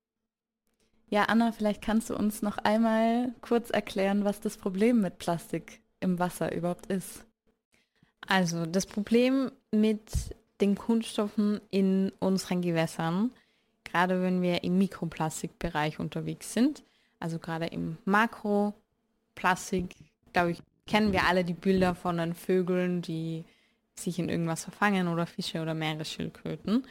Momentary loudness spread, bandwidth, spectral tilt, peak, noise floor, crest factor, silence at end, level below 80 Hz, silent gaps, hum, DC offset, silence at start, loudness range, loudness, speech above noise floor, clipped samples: 10 LU; 16.5 kHz; -5.5 dB/octave; -10 dBFS; -88 dBFS; 20 dB; 0 s; -52 dBFS; 7.65-7.71 s; none; under 0.1%; 1.1 s; 4 LU; -29 LUFS; 60 dB; under 0.1%